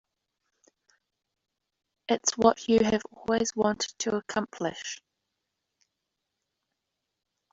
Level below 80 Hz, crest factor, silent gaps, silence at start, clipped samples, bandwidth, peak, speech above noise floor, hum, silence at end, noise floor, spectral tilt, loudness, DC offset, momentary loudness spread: -62 dBFS; 26 dB; none; 2.1 s; under 0.1%; 7.8 kHz; -6 dBFS; 57 dB; none; 2.6 s; -84 dBFS; -3.5 dB/octave; -27 LUFS; under 0.1%; 14 LU